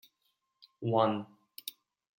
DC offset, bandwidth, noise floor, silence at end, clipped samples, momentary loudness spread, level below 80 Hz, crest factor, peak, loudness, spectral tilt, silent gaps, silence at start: under 0.1%; 17 kHz; -79 dBFS; 0.5 s; under 0.1%; 16 LU; -82 dBFS; 24 dB; -12 dBFS; -33 LUFS; -6.5 dB/octave; none; 0.8 s